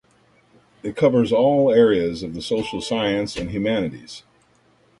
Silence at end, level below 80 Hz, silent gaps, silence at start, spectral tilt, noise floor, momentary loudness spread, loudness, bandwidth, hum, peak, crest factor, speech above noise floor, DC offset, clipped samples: 0.8 s; -50 dBFS; none; 0.85 s; -6 dB/octave; -58 dBFS; 17 LU; -20 LUFS; 11.5 kHz; none; -4 dBFS; 16 dB; 39 dB; under 0.1%; under 0.1%